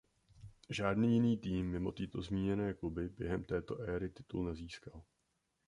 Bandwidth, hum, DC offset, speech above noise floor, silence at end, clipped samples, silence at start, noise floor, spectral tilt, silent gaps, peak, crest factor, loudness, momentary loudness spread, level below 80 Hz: 10.5 kHz; none; under 0.1%; 45 dB; 0.65 s; under 0.1%; 0.35 s; -82 dBFS; -7.5 dB/octave; none; -22 dBFS; 18 dB; -38 LUFS; 12 LU; -56 dBFS